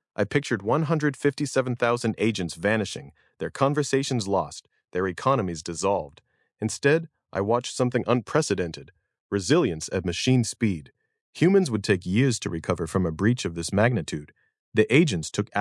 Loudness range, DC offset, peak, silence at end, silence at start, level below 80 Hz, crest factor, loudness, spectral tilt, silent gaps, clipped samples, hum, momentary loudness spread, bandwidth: 3 LU; under 0.1%; -6 dBFS; 0 s; 0.2 s; -60 dBFS; 20 dB; -25 LUFS; -5.5 dB/octave; 9.20-9.30 s, 11.21-11.33 s, 14.59-14.72 s; under 0.1%; none; 10 LU; 12 kHz